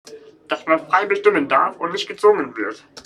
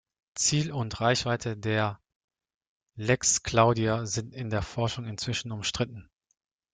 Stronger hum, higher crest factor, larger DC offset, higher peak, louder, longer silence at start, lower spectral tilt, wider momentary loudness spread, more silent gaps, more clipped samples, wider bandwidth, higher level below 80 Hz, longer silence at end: neither; about the same, 18 dB vs 22 dB; neither; first, -2 dBFS vs -8 dBFS; first, -19 LUFS vs -28 LUFS; second, 0.05 s vs 0.35 s; about the same, -4 dB/octave vs -4 dB/octave; about the same, 11 LU vs 10 LU; second, none vs 2.16-2.28 s, 2.56-2.61 s, 2.67-2.81 s; neither; first, 11 kHz vs 9.6 kHz; second, -66 dBFS vs -54 dBFS; second, 0.05 s vs 0.7 s